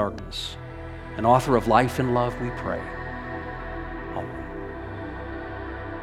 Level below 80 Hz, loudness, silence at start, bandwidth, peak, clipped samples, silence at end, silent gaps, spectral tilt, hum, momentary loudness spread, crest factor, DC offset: -40 dBFS; -27 LUFS; 0 s; 15.5 kHz; -4 dBFS; under 0.1%; 0 s; none; -6 dB/octave; none; 15 LU; 24 dB; under 0.1%